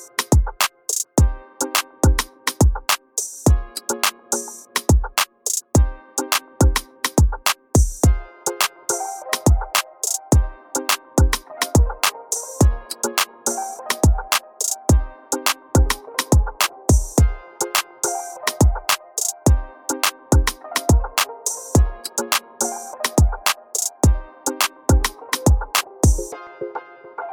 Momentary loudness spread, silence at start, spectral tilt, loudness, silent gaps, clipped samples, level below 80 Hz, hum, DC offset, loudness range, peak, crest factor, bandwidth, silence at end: 7 LU; 0 s; -4 dB/octave; -20 LUFS; none; under 0.1%; -24 dBFS; none; under 0.1%; 1 LU; -4 dBFS; 16 dB; 19 kHz; 0 s